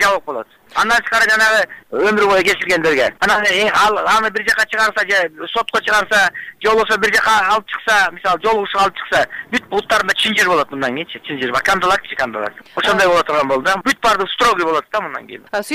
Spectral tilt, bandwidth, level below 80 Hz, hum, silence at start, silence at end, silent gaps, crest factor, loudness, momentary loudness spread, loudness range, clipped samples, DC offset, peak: -2.5 dB/octave; 16 kHz; -48 dBFS; none; 0 s; 0 s; none; 10 dB; -15 LUFS; 9 LU; 3 LU; under 0.1%; under 0.1%; -6 dBFS